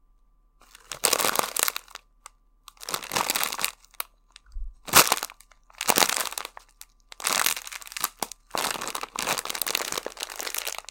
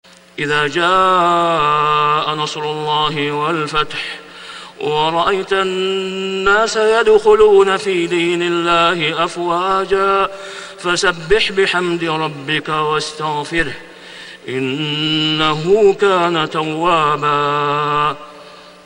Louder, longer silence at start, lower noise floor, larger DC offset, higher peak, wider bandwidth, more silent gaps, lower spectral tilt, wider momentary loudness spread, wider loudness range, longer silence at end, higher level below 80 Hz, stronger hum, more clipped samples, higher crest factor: second, -25 LUFS vs -15 LUFS; first, 0.9 s vs 0.35 s; first, -61 dBFS vs -38 dBFS; neither; about the same, 0 dBFS vs 0 dBFS; first, 17.5 kHz vs 11 kHz; neither; second, 0 dB/octave vs -4.5 dB/octave; first, 17 LU vs 12 LU; about the same, 6 LU vs 5 LU; about the same, 0.1 s vs 0.15 s; second, -50 dBFS vs -44 dBFS; neither; neither; first, 30 dB vs 16 dB